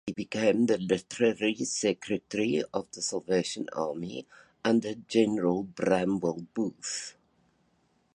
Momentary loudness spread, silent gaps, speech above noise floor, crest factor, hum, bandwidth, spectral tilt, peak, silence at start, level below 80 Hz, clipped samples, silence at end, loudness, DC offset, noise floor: 8 LU; none; 41 dB; 20 dB; none; 11 kHz; -4.5 dB/octave; -10 dBFS; 0.05 s; -66 dBFS; under 0.1%; 1.05 s; -29 LUFS; under 0.1%; -70 dBFS